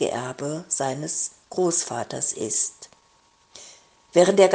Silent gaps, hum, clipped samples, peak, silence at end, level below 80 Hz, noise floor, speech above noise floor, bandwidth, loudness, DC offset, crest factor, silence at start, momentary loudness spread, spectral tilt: none; none; under 0.1%; -4 dBFS; 0 s; -70 dBFS; -60 dBFS; 37 dB; 10 kHz; -24 LUFS; under 0.1%; 22 dB; 0 s; 12 LU; -3.5 dB/octave